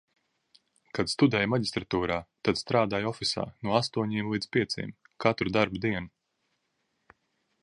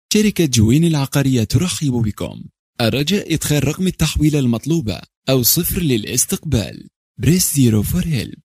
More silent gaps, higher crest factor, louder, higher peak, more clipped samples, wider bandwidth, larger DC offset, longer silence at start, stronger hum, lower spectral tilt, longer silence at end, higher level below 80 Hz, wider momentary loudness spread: second, none vs 2.59-2.73 s, 5.17-5.22 s, 6.96-7.15 s; first, 24 dB vs 16 dB; second, -29 LUFS vs -17 LUFS; second, -6 dBFS vs 0 dBFS; neither; second, 11.5 kHz vs 15.5 kHz; neither; first, 0.95 s vs 0.1 s; neither; about the same, -5.5 dB/octave vs -5 dB/octave; first, 1.55 s vs 0.1 s; second, -56 dBFS vs -34 dBFS; about the same, 8 LU vs 8 LU